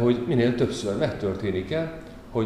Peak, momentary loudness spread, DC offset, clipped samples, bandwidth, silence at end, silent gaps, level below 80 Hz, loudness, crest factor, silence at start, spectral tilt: -10 dBFS; 10 LU; 0.2%; under 0.1%; 12 kHz; 0 s; none; -48 dBFS; -26 LUFS; 16 dB; 0 s; -7 dB/octave